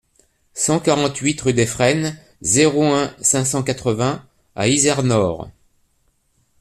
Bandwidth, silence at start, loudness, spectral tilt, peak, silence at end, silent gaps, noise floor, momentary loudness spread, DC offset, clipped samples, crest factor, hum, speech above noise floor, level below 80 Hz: 14.5 kHz; 0.55 s; -18 LUFS; -4 dB/octave; -2 dBFS; 1.1 s; none; -63 dBFS; 11 LU; under 0.1%; under 0.1%; 18 dB; none; 46 dB; -50 dBFS